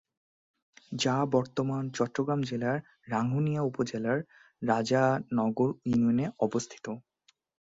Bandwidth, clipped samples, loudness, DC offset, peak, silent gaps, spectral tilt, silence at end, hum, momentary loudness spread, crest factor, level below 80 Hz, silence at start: 7.8 kHz; under 0.1%; -30 LUFS; under 0.1%; -12 dBFS; none; -6 dB/octave; 0.75 s; none; 10 LU; 18 dB; -66 dBFS; 0.9 s